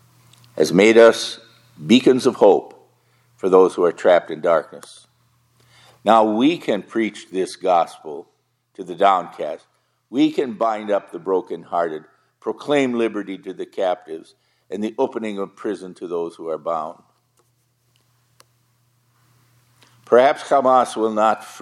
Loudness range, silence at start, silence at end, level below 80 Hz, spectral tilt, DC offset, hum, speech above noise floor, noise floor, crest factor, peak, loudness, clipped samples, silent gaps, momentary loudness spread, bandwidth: 11 LU; 0.55 s; 0 s; -72 dBFS; -5 dB/octave; under 0.1%; none; 46 dB; -64 dBFS; 20 dB; 0 dBFS; -19 LUFS; under 0.1%; none; 17 LU; 12.5 kHz